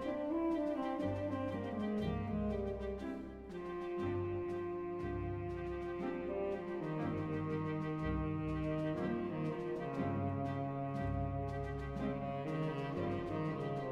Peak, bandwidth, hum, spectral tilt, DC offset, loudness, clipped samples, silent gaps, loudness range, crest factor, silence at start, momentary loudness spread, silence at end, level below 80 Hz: -26 dBFS; 10 kHz; none; -9 dB/octave; under 0.1%; -40 LUFS; under 0.1%; none; 2 LU; 12 dB; 0 s; 4 LU; 0 s; -54 dBFS